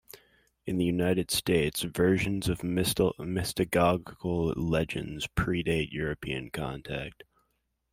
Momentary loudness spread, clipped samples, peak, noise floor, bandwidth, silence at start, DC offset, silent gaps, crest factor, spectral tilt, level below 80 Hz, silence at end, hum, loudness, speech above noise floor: 10 LU; under 0.1%; -10 dBFS; -77 dBFS; 16 kHz; 0.15 s; under 0.1%; none; 20 dB; -5 dB/octave; -48 dBFS; 0.8 s; none; -29 LUFS; 48 dB